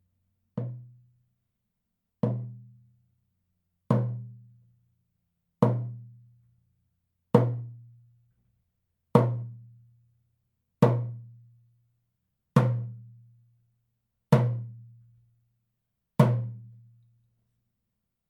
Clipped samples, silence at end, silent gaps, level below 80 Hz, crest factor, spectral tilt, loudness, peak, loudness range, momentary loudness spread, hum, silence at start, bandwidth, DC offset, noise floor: under 0.1%; 1.6 s; none; -76 dBFS; 26 dB; -9 dB/octave; -28 LUFS; -4 dBFS; 5 LU; 22 LU; none; 0.55 s; 12.5 kHz; under 0.1%; -82 dBFS